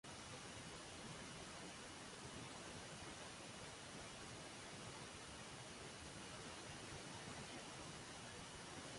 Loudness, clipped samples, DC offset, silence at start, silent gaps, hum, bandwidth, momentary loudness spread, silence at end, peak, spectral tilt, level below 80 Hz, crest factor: -53 LUFS; under 0.1%; under 0.1%; 0.05 s; none; none; 11.5 kHz; 1 LU; 0 s; -40 dBFS; -3 dB/octave; -70 dBFS; 16 dB